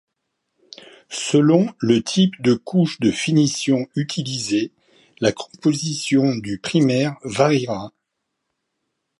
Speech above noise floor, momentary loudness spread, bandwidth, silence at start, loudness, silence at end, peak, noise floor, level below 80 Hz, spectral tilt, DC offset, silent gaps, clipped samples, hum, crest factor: 58 dB; 8 LU; 11.5 kHz; 1.1 s; -20 LUFS; 1.3 s; -2 dBFS; -77 dBFS; -60 dBFS; -5.5 dB/octave; under 0.1%; none; under 0.1%; none; 18 dB